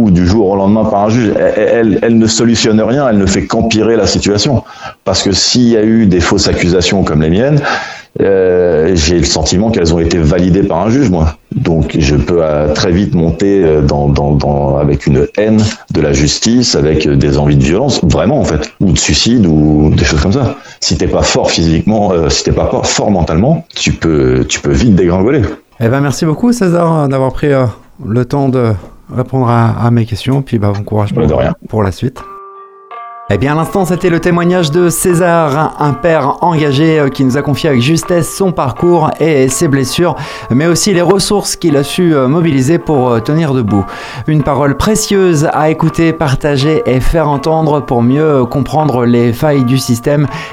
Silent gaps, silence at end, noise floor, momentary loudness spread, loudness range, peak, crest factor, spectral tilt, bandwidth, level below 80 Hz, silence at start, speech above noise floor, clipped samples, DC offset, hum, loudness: none; 0 s; -33 dBFS; 5 LU; 3 LU; 0 dBFS; 10 dB; -5.5 dB/octave; 16 kHz; -26 dBFS; 0 s; 23 dB; under 0.1%; under 0.1%; none; -10 LUFS